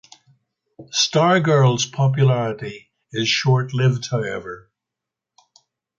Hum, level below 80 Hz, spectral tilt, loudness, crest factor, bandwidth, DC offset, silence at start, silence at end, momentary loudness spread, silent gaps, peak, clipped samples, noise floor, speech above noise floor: none; -60 dBFS; -5 dB/octave; -19 LUFS; 16 dB; 7.4 kHz; under 0.1%; 0.8 s; 1.4 s; 16 LU; none; -4 dBFS; under 0.1%; -85 dBFS; 66 dB